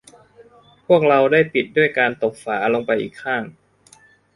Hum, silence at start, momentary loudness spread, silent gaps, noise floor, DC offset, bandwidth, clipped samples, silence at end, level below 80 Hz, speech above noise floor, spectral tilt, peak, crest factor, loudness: none; 0.9 s; 10 LU; none; -52 dBFS; under 0.1%; 11.5 kHz; under 0.1%; 0.85 s; -62 dBFS; 34 dB; -6 dB/octave; -2 dBFS; 18 dB; -18 LUFS